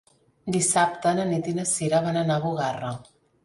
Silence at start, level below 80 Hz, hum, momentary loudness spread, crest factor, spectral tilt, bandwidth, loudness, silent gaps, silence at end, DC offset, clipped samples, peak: 0.45 s; -62 dBFS; none; 12 LU; 18 dB; -4.5 dB/octave; 11.5 kHz; -24 LUFS; none; 0.4 s; under 0.1%; under 0.1%; -8 dBFS